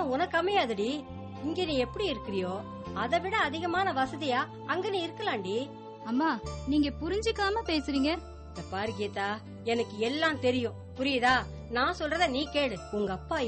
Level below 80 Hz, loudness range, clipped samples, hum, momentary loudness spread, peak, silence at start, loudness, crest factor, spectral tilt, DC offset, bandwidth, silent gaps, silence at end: -50 dBFS; 2 LU; under 0.1%; none; 9 LU; -14 dBFS; 0 s; -30 LUFS; 16 dB; -5 dB/octave; under 0.1%; 8.4 kHz; none; 0 s